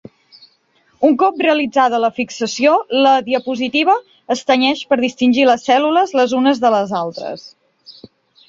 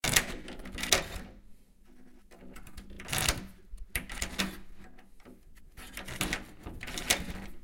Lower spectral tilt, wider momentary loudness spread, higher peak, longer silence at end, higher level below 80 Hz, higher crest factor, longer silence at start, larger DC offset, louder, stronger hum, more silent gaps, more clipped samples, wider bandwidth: first, -4 dB/octave vs -2 dB/octave; second, 8 LU vs 22 LU; about the same, -2 dBFS vs -2 dBFS; first, 0.55 s vs 0 s; second, -62 dBFS vs -46 dBFS; second, 14 dB vs 34 dB; first, 1 s vs 0.05 s; neither; first, -15 LUFS vs -33 LUFS; neither; neither; neither; second, 7.8 kHz vs 17 kHz